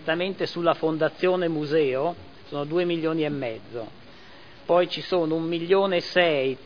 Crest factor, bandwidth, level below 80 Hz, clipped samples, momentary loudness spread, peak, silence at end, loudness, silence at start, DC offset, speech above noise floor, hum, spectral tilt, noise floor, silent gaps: 18 dB; 5.4 kHz; -64 dBFS; under 0.1%; 14 LU; -6 dBFS; 0 s; -24 LUFS; 0 s; 0.4%; 24 dB; none; -7 dB/octave; -48 dBFS; none